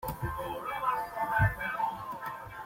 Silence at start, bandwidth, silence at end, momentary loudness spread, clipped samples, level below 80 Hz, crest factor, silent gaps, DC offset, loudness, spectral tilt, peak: 0 s; 16.5 kHz; 0 s; 11 LU; under 0.1%; -46 dBFS; 18 dB; none; under 0.1%; -33 LUFS; -6 dB/octave; -14 dBFS